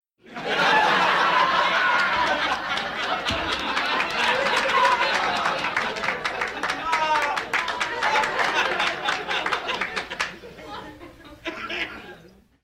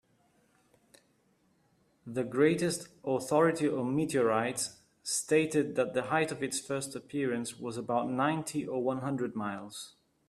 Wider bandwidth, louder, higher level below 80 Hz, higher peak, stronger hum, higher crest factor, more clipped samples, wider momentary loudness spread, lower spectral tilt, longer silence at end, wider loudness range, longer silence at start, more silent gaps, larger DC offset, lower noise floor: about the same, 16 kHz vs 15 kHz; first, -22 LUFS vs -31 LUFS; first, -54 dBFS vs -72 dBFS; first, -6 dBFS vs -14 dBFS; neither; about the same, 18 dB vs 20 dB; neither; about the same, 13 LU vs 11 LU; second, -2 dB/octave vs -4.5 dB/octave; about the same, 0.35 s vs 0.4 s; about the same, 6 LU vs 4 LU; second, 0.25 s vs 2.05 s; neither; neither; second, -50 dBFS vs -70 dBFS